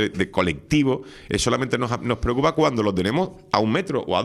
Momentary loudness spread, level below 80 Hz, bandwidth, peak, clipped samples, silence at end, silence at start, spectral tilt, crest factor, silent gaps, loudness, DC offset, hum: 4 LU; -42 dBFS; 13 kHz; -2 dBFS; under 0.1%; 0 s; 0 s; -5.5 dB/octave; 20 dB; none; -22 LUFS; under 0.1%; none